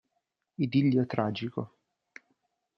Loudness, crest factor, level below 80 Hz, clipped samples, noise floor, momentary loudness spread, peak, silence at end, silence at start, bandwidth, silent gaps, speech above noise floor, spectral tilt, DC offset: -29 LUFS; 22 dB; -72 dBFS; under 0.1%; -81 dBFS; 18 LU; -10 dBFS; 1.1 s; 0.6 s; 6.2 kHz; none; 53 dB; -9 dB/octave; under 0.1%